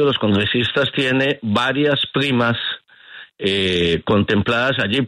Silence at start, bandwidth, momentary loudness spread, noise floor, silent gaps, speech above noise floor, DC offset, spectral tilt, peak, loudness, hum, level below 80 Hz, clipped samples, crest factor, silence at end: 0 s; 11.5 kHz; 4 LU; -41 dBFS; none; 24 dB; under 0.1%; -6 dB/octave; -4 dBFS; -18 LUFS; none; -48 dBFS; under 0.1%; 14 dB; 0 s